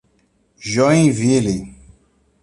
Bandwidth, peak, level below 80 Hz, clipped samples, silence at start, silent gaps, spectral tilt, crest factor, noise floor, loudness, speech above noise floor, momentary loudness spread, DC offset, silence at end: 11.5 kHz; -2 dBFS; -46 dBFS; under 0.1%; 0.6 s; none; -6 dB/octave; 16 dB; -61 dBFS; -16 LUFS; 46 dB; 17 LU; under 0.1%; 0.75 s